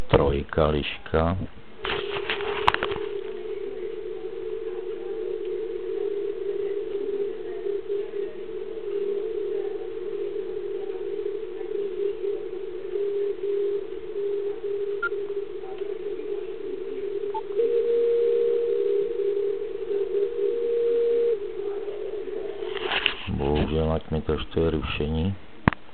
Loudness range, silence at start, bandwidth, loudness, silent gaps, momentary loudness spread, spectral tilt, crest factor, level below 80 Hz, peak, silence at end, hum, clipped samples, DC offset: 6 LU; 0 s; 4.5 kHz; -28 LUFS; none; 10 LU; -4.5 dB/octave; 26 dB; -42 dBFS; 0 dBFS; 0 s; none; under 0.1%; 1%